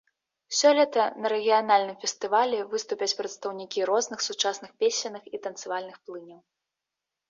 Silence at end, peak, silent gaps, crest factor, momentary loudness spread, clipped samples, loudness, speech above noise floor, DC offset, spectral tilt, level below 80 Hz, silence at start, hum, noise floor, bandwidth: 0.95 s; -8 dBFS; none; 18 dB; 14 LU; under 0.1%; -26 LUFS; 61 dB; under 0.1%; -1 dB/octave; -80 dBFS; 0.5 s; none; -87 dBFS; 7.6 kHz